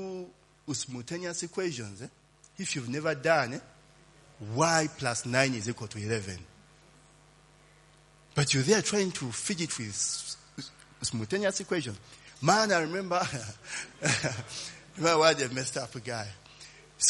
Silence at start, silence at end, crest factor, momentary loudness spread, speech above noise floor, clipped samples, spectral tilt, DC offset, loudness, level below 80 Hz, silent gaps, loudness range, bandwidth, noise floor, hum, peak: 0 s; 0 s; 26 dB; 19 LU; 29 dB; under 0.1%; -3.5 dB/octave; under 0.1%; -30 LUFS; -66 dBFS; none; 4 LU; 11.5 kHz; -59 dBFS; none; -6 dBFS